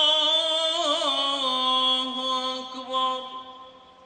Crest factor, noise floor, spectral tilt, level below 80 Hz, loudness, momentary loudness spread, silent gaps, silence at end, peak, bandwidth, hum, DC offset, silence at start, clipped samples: 16 dB; -47 dBFS; 0 dB/octave; -72 dBFS; -23 LUFS; 13 LU; none; 0.3 s; -10 dBFS; 9.6 kHz; none; under 0.1%; 0 s; under 0.1%